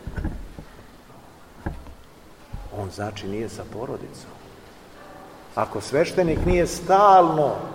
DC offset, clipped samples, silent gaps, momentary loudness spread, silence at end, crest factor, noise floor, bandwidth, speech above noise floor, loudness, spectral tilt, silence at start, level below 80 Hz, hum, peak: 0.1%; under 0.1%; none; 27 LU; 0 s; 20 dB; -47 dBFS; 16 kHz; 26 dB; -22 LUFS; -6 dB/octave; 0 s; -38 dBFS; none; -4 dBFS